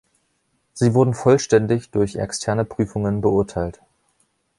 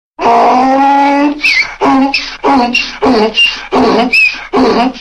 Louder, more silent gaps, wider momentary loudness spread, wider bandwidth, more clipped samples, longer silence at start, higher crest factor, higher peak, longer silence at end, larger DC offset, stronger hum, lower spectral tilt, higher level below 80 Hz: second, -20 LUFS vs -9 LUFS; neither; first, 9 LU vs 4 LU; about the same, 11.5 kHz vs 11.5 kHz; neither; first, 0.75 s vs 0.2 s; first, 18 dB vs 8 dB; about the same, -2 dBFS vs 0 dBFS; first, 0.85 s vs 0 s; second, under 0.1% vs 0.2%; neither; first, -6.5 dB/octave vs -4 dB/octave; second, -46 dBFS vs -40 dBFS